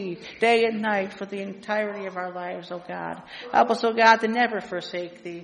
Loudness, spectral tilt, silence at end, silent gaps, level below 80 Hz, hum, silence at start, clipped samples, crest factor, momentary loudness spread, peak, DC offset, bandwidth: -24 LUFS; -4.5 dB/octave; 0 s; none; -70 dBFS; none; 0 s; under 0.1%; 22 dB; 16 LU; -2 dBFS; under 0.1%; 10 kHz